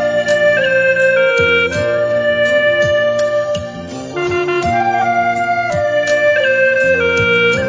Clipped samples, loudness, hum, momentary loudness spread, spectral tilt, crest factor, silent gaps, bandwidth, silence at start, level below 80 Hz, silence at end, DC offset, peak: under 0.1%; -13 LUFS; none; 6 LU; -4.5 dB/octave; 12 dB; none; 7.8 kHz; 0 s; -42 dBFS; 0 s; under 0.1%; -2 dBFS